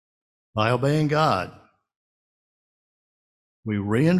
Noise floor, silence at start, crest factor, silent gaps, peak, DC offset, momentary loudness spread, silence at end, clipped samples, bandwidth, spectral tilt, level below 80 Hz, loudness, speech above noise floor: under -90 dBFS; 0.55 s; 20 dB; 1.96-3.63 s; -6 dBFS; under 0.1%; 13 LU; 0 s; under 0.1%; 13 kHz; -7 dB/octave; -56 dBFS; -23 LUFS; over 69 dB